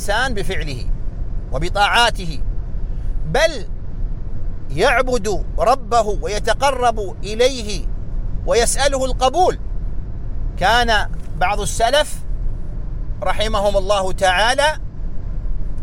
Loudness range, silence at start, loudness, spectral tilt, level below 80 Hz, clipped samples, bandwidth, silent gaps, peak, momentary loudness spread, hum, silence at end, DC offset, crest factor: 2 LU; 0 s; -19 LUFS; -3.5 dB/octave; -24 dBFS; under 0.1%; 16 kHz; none; -2 dBFS; 15 LU; none; 0 s; under 0.1%; 14 dB